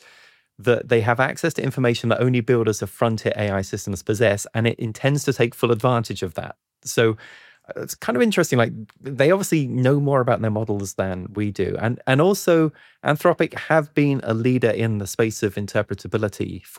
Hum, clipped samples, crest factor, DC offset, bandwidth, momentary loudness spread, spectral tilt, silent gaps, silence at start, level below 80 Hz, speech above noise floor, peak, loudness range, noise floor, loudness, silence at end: none; under 0.1%; 16 dB; under 0.1%; 17 kHz; 9 LU; -6 dB/octave; none; 0.6 s; -58 dBFS; 32 dB; -4 dBFS; 2 LU; -53 dBFS; -21 LUFS; 0 s